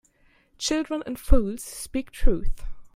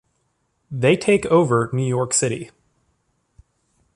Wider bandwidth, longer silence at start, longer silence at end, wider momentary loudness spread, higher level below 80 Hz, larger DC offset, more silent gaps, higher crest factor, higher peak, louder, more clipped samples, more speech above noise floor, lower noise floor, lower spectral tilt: first, 15 kHz vs 11.5 kHz; about the same, 0.6 s vs 0.7 s; second, 0.15 s vs 1.5 s; second, 9 LU vs 15 LU; first, -26 dBFS vs -56 dBFS; neither; neither; about the same, 22 dB vs 18 dB; about the same, -2 dBFS vs -2 dBFS; second, -28 LUFS vs -19 LUFS; neither; second, 40 dB vs 51 dB; second, -61 dBFS vs -69 dBFS; about the same, -5 dB/octave vs -5 dB/octave